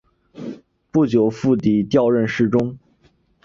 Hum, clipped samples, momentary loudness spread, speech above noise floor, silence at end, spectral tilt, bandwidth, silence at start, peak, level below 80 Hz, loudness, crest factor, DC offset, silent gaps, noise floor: none; under 0.1%; 18 LU; 42 dB; 0.65 s; -8 dB/octave; 7.4 kHz; 0.35 s; -4 dBFS; -54 dBFS; -18 LUFS; 16 dB; under 0.1%; none; -59 dBFS